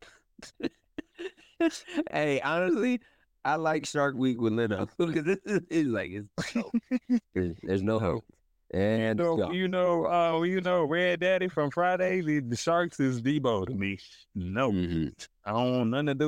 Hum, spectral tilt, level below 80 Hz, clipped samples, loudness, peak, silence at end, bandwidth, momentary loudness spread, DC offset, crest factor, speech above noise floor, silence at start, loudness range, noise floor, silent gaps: none; -6 dB/octave; -60 dBFS; under 0.1%; -29 LUFS; -14 dBFS; 0 s; 15 kHz; 10 LU; under 0.1%; 14 dB; 25 dB; 0.4 s; 4 LU; -53 dBFS; none